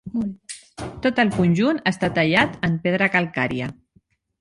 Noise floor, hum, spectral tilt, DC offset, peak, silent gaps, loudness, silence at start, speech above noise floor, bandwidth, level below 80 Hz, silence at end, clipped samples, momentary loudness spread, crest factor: -61 dBFS; none; -6 dB/octave; under 0.1%; -2 dBFS; none; -21 LUFS; 0.05 s; 41 dB; 11.5 kHz; -50 dBFS; 0.7 s; under 0.1%; 15 LU; 20 dB